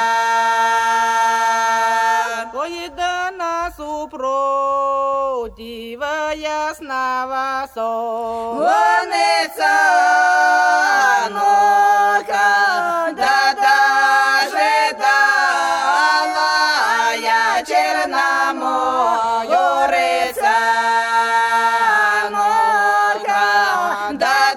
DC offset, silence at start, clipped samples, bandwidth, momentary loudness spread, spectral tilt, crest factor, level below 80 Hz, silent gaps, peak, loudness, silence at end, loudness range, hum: under 0.1%; 0 s; under 0.1%; 17 kHz; 9 LU; -1 dB/octave; 14 dB; -54 dBFS; none; -2 dBFS; -16 LUFS; 0 s; 7 LU; none